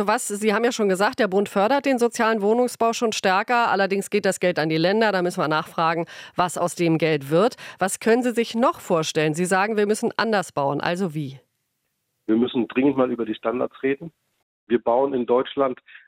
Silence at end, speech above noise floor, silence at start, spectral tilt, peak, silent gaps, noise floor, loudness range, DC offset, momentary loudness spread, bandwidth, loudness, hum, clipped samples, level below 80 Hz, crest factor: 0.1 s; 53 dB; 0 s; -4.5 dB/octave; -6 dBFS; 14.43-14.67 s; -75 dBFS; 4 LU; under 0.1%; 6 LU; 16.5 kHz; -22 LUFS; none; under 0.1%; -68 dBFS; 16 dB